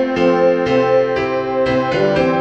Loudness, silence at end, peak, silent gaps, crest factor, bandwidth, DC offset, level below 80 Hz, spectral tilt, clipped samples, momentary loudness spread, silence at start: -15 LUFS; 0 s; -2 dBFS; none; 12 dB; 7.8 kHz; 0.2%; -44 dBFS; -7 dB/octave; under 0.1%; 4 LU; 0 s